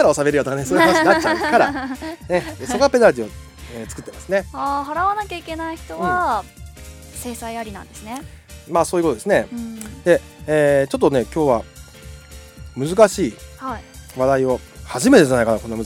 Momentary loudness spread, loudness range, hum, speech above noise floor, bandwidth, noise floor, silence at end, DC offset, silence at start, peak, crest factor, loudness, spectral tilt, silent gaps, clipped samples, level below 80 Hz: 21 LU; 7 LU; none; 21 dB; 18 kHz; -39 dBFS; 0 s; under 0.1%; 0 s; 0 dBFS; 20 dB; -18 LUFS; -5 dB/octave; none; under 0.1%; -42 dBFS